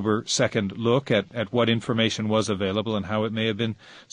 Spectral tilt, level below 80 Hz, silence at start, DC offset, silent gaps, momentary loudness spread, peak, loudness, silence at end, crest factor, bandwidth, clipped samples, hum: -5 dB/octave; -54 dBFS; 0 s; under 0.1%; none; 4 LU; -6 dBFS; -24 LUFS; 0.1 s; 18 dB; 10.5 kHz; under 0.1%; none